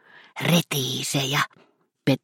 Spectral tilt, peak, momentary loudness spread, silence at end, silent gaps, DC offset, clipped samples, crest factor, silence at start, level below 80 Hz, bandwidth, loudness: -4 dB/octave; -8 dBFS; 8 LU; 0.05 s; none; under 0.1%; under 0.1%; 18 dB; 0.35 s; -64 dBFS; 16.5 kHz; -24 LUFS